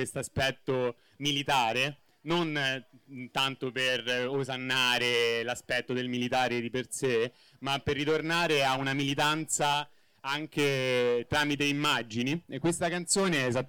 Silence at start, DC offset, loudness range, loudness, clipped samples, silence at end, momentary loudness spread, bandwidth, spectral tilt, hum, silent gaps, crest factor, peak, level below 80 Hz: 0 s; under 0.1%; 2 LU; -29 LUFS; under 0.1%; 0 s; 8 LU; 19 kHz; -3.5 dB/octave; none; none; 16 dB; -14 dBFS; -60 dBFS